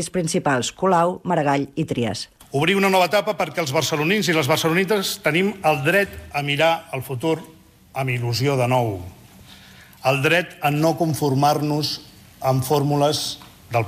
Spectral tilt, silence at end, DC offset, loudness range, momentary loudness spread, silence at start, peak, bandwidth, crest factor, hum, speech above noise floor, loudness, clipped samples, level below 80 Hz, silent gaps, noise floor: -5 dB/octave; 0 s; under 0.1%; 3 LU; 9 LU; 0 s; -6 dBFS; 16 kHz; 14 dB; none; 26 dB; -20 LUFS; under 0.1%; -54 dBFS; none; -46 dBFS